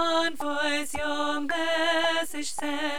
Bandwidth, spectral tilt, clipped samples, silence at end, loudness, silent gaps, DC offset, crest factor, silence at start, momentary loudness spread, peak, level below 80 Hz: 19.5 kHz; -1.5 dB/octave; under 0.1%; 0 s; -27 LUFS; none; 2%; 16 dB; 0 s; 6 LU; -12 dBFS; -58 dBFS